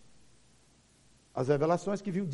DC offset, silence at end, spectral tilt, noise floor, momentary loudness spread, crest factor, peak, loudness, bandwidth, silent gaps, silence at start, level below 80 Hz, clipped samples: under 0.1%; 0 s; -7.5 dB/octave; -64 dBFS; 9 LU; 20 dB; -14 dBFS; -31 LUFS; 11.5 kHz; none; 1.35 s; -68 dBFS; under 0.1%